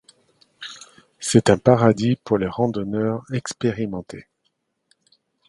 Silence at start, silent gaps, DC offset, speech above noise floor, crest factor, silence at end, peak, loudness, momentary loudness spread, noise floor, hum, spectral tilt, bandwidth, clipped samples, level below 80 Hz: 0.6 s; none; under 0.1%; 52 dB; 22 dB; 1.25 s; 0 dBFS; -20 LUFS; 21 LU; -72 dBFS; none; -6 dB/octave; 11.5 kHz; under 0.1%; -52 dBFS